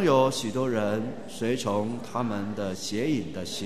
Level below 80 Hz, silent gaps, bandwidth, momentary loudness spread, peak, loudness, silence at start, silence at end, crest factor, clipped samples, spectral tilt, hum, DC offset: -62 dBFS; none; 13.5 kHz; 7 LU; -8 dBFS; -28 LUFS; 0 s; 0 s; 20 dB; under 0.1%; -5 dB/octave; none; 0.8%